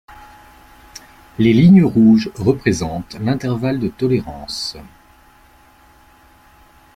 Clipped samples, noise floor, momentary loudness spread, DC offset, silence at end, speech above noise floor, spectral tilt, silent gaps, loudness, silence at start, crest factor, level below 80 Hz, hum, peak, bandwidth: under 0.1%; -49 dBFS; 16 LU; under 0.1%; 2.1 s; 34 dB; -7 dB/octave; none; -16 LUFS; 0.95 s; 16 dB; -44 dBFS; none; -2 dBFS; 13.5 kHz